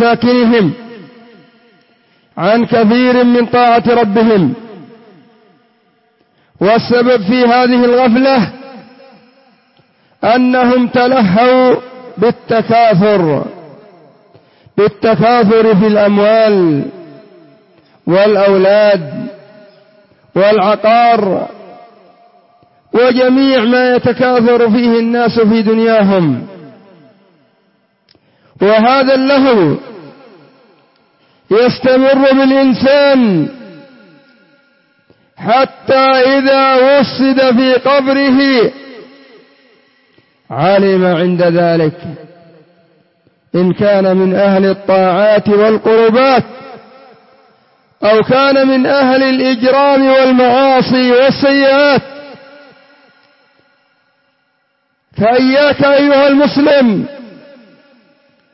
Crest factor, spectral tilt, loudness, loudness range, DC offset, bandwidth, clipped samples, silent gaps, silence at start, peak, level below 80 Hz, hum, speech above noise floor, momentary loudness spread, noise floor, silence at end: 10 dB; -9.5 dB/octave; -10 LUFS; 5 LU; under 0.1%; 5.8 kHz; under 0.1%; none; 0 s; 0 dBFS; -54 dBFS; none; 53 dB; 9 LU; -61 dBFS; 1.25 s